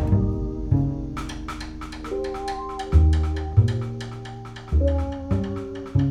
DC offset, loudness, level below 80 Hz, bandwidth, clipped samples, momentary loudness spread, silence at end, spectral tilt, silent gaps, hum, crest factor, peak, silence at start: under 0.1%; -25 LUFS; -30 dBFS; 9.6 kHz; under 0.1%; 14 LU; 0 s; -8 dB/octave; none; none; 18 dB; -4 dBFS; 0 s